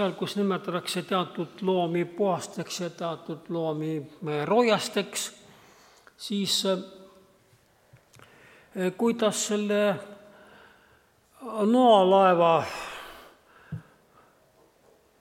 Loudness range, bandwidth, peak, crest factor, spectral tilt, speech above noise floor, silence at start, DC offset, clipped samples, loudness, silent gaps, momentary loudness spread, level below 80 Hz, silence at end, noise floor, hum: 7 LU; 16.5 kHz; -8 dBFS; 20 dB; -4.5 dB/octave; 36 dB; 0 s; under 0.1%; under 0.1%; -26 LUFS; none; 21 LU; -70 dBFS; 1.4 s; -62 dBFS; none